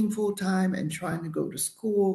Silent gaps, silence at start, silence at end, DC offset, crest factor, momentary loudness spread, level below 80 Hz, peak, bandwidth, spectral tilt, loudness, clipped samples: none; 0 s; 0 s; under 0.1%; 12 dB; 5 LU; -66 dBFS; -16 dBFS; 13 kHz; -5.5 dB/octave; -29 LUFS; under 0.1%